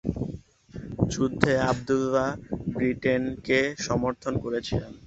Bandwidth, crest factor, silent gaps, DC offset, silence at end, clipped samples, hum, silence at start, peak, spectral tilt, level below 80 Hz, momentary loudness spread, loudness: 8 kHz; 24 dB; none; under 0.1%; 0 s; under 0.1%; none; 0.05 s; -2 dBFS; -6 dB/octave; -46 dBFS; 12 LU; -27 LUFS